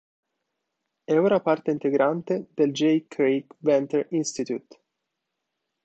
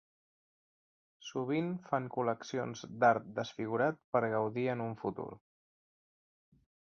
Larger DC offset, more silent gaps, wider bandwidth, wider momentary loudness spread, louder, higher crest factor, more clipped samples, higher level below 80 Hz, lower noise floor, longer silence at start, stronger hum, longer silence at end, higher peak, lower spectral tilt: neither; second, none vs 4.04-4.12 s; first, 8.6 kHz vs 7 kHz; second, 8 LU vs 12 LU; first, -24 LUFS vs -35 LUFS; about the same, 18 dB vs 22 dB; neither; about the same, -72 dBFS vs -76 dBFS; second, -82 dBFS vs under -90 dBFS; about the same, 1.1 s vs 1.2 s; neither; second, 1.25 s vs 1.45 s; first, -8 dBFS vs -14 dBFS; about the same, -5.5 dB/octave vs -5.5 dB/octave